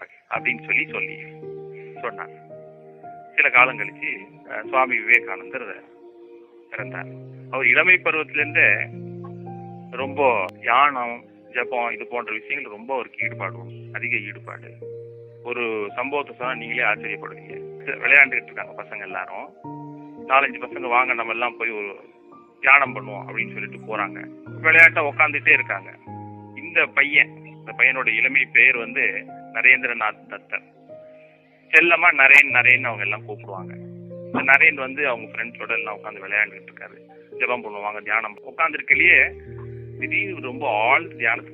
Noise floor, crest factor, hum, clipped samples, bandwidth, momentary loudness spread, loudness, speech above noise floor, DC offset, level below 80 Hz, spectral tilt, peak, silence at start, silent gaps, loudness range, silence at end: -52 dBFS; 22 dB; none; under 0.1%; 13 kHz; 23 LU; -18 LUFS; 31 dB; under 0.1%; -64 dBFS; -5 dB/octave; 0 dBFS; 0 s; none; 10 LU; 0 s